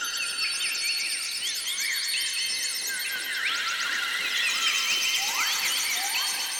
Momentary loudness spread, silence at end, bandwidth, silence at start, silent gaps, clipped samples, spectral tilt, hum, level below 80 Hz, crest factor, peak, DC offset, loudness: 5 LU; 0 s; 18 kHz; 0 s; none; under 0.1%; 3.5 dB/octave; none; -76 dBFS; 16 dB; -12 dBFS; under 0.1%; -25 LUFS